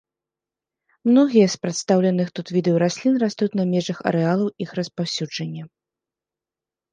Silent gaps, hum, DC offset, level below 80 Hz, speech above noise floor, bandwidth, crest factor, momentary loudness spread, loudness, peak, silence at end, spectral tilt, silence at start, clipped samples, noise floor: none; none; under 0.1%; -68 dBFS; 69 dB; 9.6 kHz; 18 dB; 11 LU; -21 LUFS; -4 dBFS; 1.25 s; -6 dB/octave; 1.05 s; under 0.1%; -89 dBFS